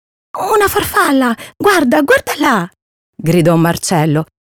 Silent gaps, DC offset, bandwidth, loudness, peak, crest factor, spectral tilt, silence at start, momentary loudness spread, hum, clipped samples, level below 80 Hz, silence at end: 2.82-3.13 s; under 0.1%; over 20 kHz; -13 LUFS; -2 dBFS; 12 dB; -5 dB/octave; 0.35 s; 8 LU; none; under 0.1%; -44 dBFS; 0.2 s